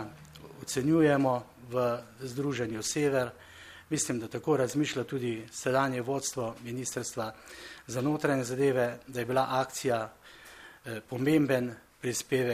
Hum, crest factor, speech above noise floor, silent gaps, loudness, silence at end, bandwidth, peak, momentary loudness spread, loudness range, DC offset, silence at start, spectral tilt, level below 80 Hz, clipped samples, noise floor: none; 18 dB; 19 dB; none; -31 LUFS; 0 s; 15.5 kHz; -12 dBFS; 18 LU; 3 LU; under 0.1%; 0 s; -5 dB/octave; -66 dBFS; under 0.1%; -49 dBFS